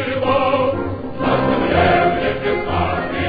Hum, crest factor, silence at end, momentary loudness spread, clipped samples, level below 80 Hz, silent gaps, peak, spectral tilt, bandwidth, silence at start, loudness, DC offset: none; 14 dB; 0 s; 6 LU; under 0.1%; -38 dBFS; none; -2 dBFS; -9 dB/octave; 5 kHz; 0 s; -18 LUFS; under 0.1%